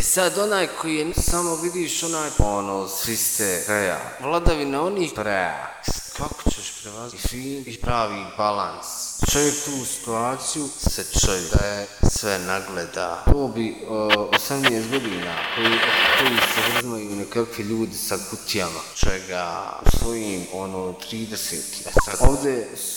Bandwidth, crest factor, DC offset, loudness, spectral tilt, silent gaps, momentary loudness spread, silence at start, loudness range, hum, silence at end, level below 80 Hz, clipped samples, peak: over 20 kHz; 22 dB; under 0.1%; -23 LUFS; -3 dB/octave; none; 10 LU; 0 s; 7 LU; none; 0 s; -30 dBFS; under 0.1%; 0 dBFS